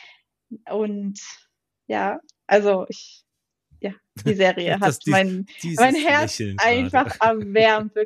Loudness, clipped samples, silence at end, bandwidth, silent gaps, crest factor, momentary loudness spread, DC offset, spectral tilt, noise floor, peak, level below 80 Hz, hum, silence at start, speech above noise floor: -20 LUFS; under 0.1%; 0 s; 14 kHz; none; 16 dB; 16 LU; under 0.1%; -4.5 dB/octave; -64 dBFS; -4 dBFS; -60 dBFS; none; 0.5 s; 43 dB